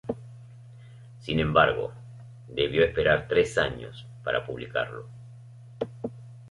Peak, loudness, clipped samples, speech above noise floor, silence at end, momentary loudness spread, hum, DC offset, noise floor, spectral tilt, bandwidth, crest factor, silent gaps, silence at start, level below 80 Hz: -6 dBFS; -26 LUFS; under 0.1%; 22 dB; 0 s; 25 LU; none; under 0.1%; -47 dBFS; -5.5 dB/octave; 11.5 kHz; 22 dB; none; 0.05 s; -48 dBFS